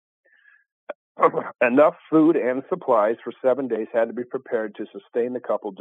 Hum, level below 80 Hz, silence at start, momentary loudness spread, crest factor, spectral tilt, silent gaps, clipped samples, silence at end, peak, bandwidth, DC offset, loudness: none; -82 dBFS; 0.9 s; 14 LU; 20 dB; -8.5 dB/octave; 0.95-1.15 s; under 0.1%; 0.05 s; -4 dBFS; 3.9 kHz; under 0.1%; -22 LUFS